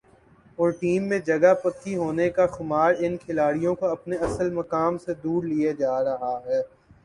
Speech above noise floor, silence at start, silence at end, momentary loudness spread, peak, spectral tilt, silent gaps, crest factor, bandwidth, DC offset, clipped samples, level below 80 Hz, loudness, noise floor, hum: 32 dB; 0.6 s; 0.4 s; 8 LU; -6 dBFS; -7 dB/octave; none; 18 dB; 11 kHz; under 0.1%; under 0.1%; -54 dBFS; -24 LUFS; -55 dBFS; none